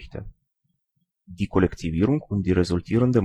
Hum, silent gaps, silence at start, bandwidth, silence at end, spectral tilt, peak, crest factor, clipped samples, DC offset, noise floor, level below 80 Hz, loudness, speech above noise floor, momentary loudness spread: none; none; 0 s; 11 kHz; 0 s; -8 dB/octave; -6 dBFS; 18 dB; under 0.1%; under 0.1%; -75 dBFS; -42 dBFS; -23 LUFS; 53 dB; 11 LU